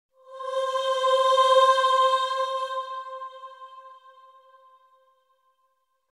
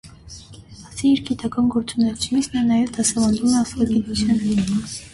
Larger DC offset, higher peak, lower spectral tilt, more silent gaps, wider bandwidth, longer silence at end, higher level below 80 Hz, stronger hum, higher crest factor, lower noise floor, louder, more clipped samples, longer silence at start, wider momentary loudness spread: neither; about the same, -8 dBFS vs -6 dBFS; second, 2.5 dB/octave vs -4.5 dB/octave; neither; about the same, 12 kHz vs 11.5 kHz; first, 2.2 s vs 0.05 s; second, -88 dBFS vs -44 dBFS; neither; about the same, 18 dB vs 16 dB; first, -72 dBFS vs -41 dBFS; about the same, -22 LUFS vs -20 LUFS; neither; first, 0.3 s vs 0.05 s; first, 23 LU vs 12 LU